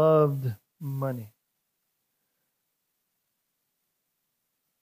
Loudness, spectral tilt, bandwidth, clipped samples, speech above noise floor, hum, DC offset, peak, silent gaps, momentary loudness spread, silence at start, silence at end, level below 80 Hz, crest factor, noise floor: -28 LUFS; -9.5 dB/octave; 15.5 kHz; under 0.1%; 55 dB; none; under 0.1%; -10 dBFS; none; 17 LU; 0 s; 3.55 s; -78 dBFS; 20 dB; -79 dBFS